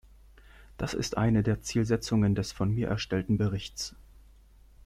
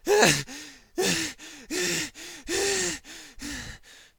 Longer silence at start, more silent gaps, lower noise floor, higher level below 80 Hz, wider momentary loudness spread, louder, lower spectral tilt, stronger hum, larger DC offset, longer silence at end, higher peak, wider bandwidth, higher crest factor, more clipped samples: first, 0.6 s vs 0.05 s; neither; first, -56 dBFS vs -47 dBFS; about the same, -48 dBFS vs -52 dBFS; second, 10 LU vs 20 LU; second, -29 LUFS vs -26 LUFS; first, -6 dB/octave vs -2 dB/octave; neither; neither; first, 0.85 s vs 0.15 s; second, -12 dBFS vs -4 dBFS; second, 14 kHz vs over 20 kHz; second, 18 dB vs 24 dB; neither